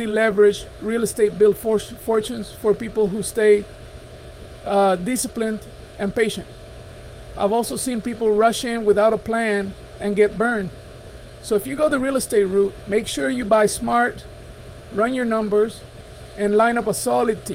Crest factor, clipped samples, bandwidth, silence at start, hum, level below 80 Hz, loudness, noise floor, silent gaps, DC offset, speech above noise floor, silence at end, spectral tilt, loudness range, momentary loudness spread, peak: 16 dB; under 0.1%; 16.5 kHz; 0 s; none; -46 dBFS; -20 LUFS; -39 dBFS; none; under 0.1%; 19 dB; 0 s; -4.5 dB/octave; 4 LU; 23 LU; -4 dBFS